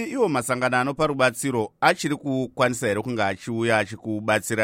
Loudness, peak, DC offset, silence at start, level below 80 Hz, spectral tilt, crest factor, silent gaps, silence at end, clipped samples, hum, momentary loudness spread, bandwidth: -23 LUFS; -4 dBFS; under 0.1%; 0 s; -60 dBFS; -4.5 dB/octave; 18 dB; none; 0 s; under 0.1%; none; 5 LU; 16 kHz